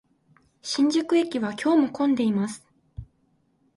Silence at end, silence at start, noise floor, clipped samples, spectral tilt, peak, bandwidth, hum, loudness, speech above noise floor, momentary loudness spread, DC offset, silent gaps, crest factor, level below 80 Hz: 0.75 s; 0.65 s; -67 dBFS; under 0.1%; -5 dB/octave; -12 dBFS; 11.5 kHz; none; -24 LUFS; 44 dB; 23 LU; under 0.1%; none; 14 dB; -56 dBFS